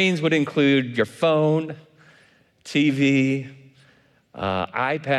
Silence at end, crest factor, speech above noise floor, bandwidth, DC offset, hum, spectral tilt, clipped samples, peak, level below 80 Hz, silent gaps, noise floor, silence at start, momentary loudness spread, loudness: 0 s; 14 dB; 37 dB; 11.5 kHz; under 0.1%; none; -6 dB/octave; under 0.1%; -8 dBFS; -66 dBFS; none; -58 dBFS; 0 s; 11 LU; -21 LUFS